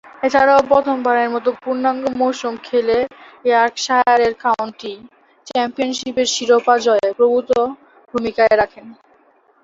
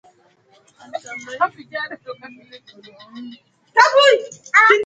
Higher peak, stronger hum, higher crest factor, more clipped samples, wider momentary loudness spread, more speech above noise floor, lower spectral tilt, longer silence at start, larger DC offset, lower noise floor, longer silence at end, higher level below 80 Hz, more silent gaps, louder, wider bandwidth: about the same, 0 dBFS vs 0 dBFS; neither; about the same, 16 dB vs 20 dB; neither; second, 10 LU vs 25 LU; about the same, 38 dB vs 36 dB; first, -3 dB/octave vs -1 dB/octave; second, 0.2 s vs 0.95 s; neither; about the same, -54 dBFS vs -56 dBFS; first, 0.7 s vs 0 s; first, -54 dBFS vs -74 dBFS; neither; about the same, -17 LUFS vs -16 LUFS; second, 8 kHz vs 9.2 kHz